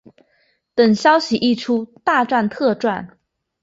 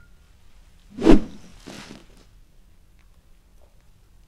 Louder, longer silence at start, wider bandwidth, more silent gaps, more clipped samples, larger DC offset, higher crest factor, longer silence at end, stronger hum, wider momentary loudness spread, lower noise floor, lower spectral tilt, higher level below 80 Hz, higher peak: about the same, -18 LUFS vs -19 LUFS; second, 0.75 s vs 1 s; second, 7.8 kHz vs 9.6 kHz; neither; neither; neither; second, 18 dB vs 24 dB; second, 0.55 s vs 3 s; neither; second, 8 LU vs 27 LU; first, -63 dBFS vs -52 dBFS; second, -5 dB/octave vs -7 dB/octave; second, -60 dBFS vs -32 dBFS; about the same, -2 dBFS vs 0 dBFS